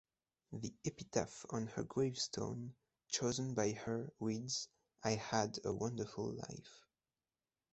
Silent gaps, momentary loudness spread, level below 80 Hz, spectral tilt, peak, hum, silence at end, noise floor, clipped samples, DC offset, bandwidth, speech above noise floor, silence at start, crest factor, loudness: none; 11 LU; -70 dBFS; -4.5 dB/octave; -20 dBFS; none; 0.95 s; under -90 dBFS; under 0.1%; under 0.1%; 8.2 kHz; over 49 dB; 0.5 s; 24 dB; -41 LUFS